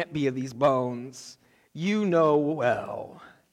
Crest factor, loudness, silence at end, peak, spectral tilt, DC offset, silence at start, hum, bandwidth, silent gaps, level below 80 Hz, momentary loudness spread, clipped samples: 16 dB; -25 LUFS; 0.25 s; -12 dBFS; -6.5 dB/octave; under 0.1%; 0 s; none; 13 kHz; none; -68 dBFS; 22 LU; under 0.1%